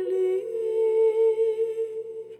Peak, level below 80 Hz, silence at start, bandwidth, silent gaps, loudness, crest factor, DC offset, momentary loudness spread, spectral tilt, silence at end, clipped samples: -14 dBFS; under -90 dBFS; 0 s; 8.8 kHz; none; -24 LUFS; 10 dB; under 0.1%; 10 LU; -6 dB/octave; 0.05 s; under 0.1%